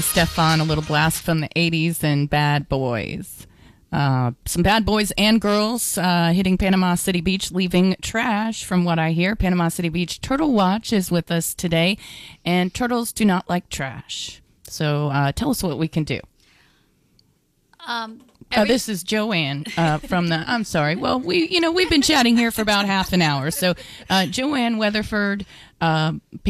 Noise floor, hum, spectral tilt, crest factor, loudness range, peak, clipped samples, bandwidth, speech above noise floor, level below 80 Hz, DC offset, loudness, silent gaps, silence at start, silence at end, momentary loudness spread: -63 dBFS; none; -4.5 dB/octave; 14 dB; 6 LU; -6 dBFS; under 0.1%; 16 kHz; 43 dB; -40 dBFS; under 0.1%; -20 LUFS; none; 0 s; 0 s; 10 LU